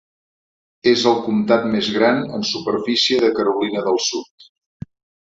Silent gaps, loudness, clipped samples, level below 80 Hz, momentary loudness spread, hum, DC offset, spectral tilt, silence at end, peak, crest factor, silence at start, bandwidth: 4.31-4.38 s; -18 LUFS; under 0.1%; -58 dBFS; 13 LU; none; under 0.1%; -4 dB/octave; 0.8 s; -2 dBFS; 18 dB; 0.85 s; 7.8 kHz